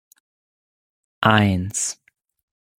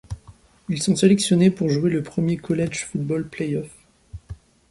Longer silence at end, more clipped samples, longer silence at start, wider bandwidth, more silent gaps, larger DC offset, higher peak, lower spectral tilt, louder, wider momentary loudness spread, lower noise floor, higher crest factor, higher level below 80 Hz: first, 0.85 s vs 0.35 s; neither; first, 1.2 s vs 0.1 s; first, 16 kHz vs 11.5 kHz; neither; neither; about the same, -2 dBFS vs -4 dBFS; second, -4 dB/octave vs -6 dB/octave; about the same, -20 LUFS vs -21 LUFS; second, 10 LU vs 23 LU; first, under -90 dBFS vs -50 dBFS; about the same, 22 dB vs 20 dB; second, -58 dBFS vs -48 dBFS